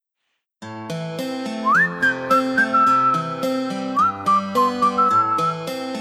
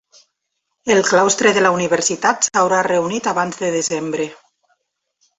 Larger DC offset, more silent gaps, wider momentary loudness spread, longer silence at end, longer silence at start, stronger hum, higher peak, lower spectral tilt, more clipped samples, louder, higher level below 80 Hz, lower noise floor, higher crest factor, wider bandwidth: neither; neither; about the same, 11 LU vs 9 LU; second, 0 s vs 1.05 s; second, 0.6 s vs 0.85 s; neither; second, -6 dBFS vs 0 dBFS; first, -5 dB/octave vs -3 dB/octave; neither; second, -19 LUFS vs -16 LUFS; about the same, -64 dBFS vs -60 dBFS; about the same, -76 dBFS vs -75 dBFS; about the same, 14 dB vs 18 dB; first, 15 kHz vs 8.4 kHz